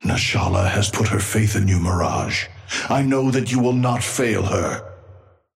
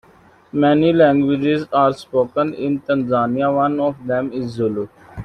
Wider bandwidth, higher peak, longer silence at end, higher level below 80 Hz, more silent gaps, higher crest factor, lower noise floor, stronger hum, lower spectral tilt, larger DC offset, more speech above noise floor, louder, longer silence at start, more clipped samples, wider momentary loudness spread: first, 16 kHz vs 10 kHz; second, -6 dBFS vs -2 dBFS; first, 0.4 s vs 0 s; first, -42 dBFS vs -52 dBFS; neither; about the same, 14 dB vs 16 dB; about the same, -47 dBFS vs -50 dBFS; neither; second, -5 dB/octave vs -8 dB/octave; neither; second, 28 dB vs 33 dB; about the same, -20 LUFS vs -18 LUFS; second, 0 s vs 0.55 s; neither; second, 5 LU vs 9 LU